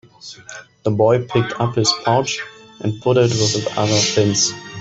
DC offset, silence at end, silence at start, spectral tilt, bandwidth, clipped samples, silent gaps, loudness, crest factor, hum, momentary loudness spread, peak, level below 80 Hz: under 0.1%; 0 s; 0.25 s; -4 dB/octave; 8.2 kHz; under 0.1%; none; -17 LUFS; 16 dB; none; 19 LU; -2 dBFS; -54 dBFS